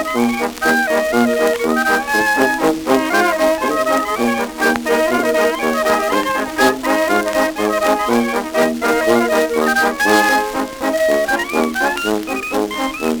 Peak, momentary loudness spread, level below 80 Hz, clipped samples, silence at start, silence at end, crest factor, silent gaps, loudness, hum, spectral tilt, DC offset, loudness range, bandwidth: 0 dBFS; 5 LU; -46 dBFS; under 0.1%; 0 s; 0 s; 16 dB; none; -16 LUFS; none; -3 dB/octave; under 0.1%; 1 LU; over 20 kHz